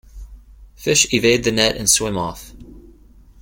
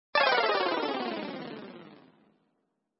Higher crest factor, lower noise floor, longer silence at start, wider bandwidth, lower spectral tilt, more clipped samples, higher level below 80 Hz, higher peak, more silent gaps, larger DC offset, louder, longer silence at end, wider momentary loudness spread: about the same, 20 dB vs 22 dB; second, -46 dBFS vs -78 dBFS; about the same, 0.15 s vs 0.15 s; first, 17 kHz vs 5.8 kHz; second, -2.5 dB/octave vs -6.5 dB/octave; neither; first, -40 dBFS vs -90 dBFS; first, 0 dBFS vs -10 dBFS; neither; neither; first, -16 LUFS vs -28 LUFS; second, 0.55 s vs 1.05 s; second, 13 LU vs 21 LU